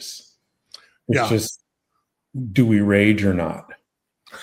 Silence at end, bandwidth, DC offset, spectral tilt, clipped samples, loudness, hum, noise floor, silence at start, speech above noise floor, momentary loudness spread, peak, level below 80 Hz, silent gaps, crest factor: 0 s; 16.5 kHz; under 0.1%; -6 dB/octave; under 0.1%; -19 LUFS; none; -74 dBFS; 0 s; 56 dB; 21 LU; -4 dBFS; -54 dBFS; none; 18 dB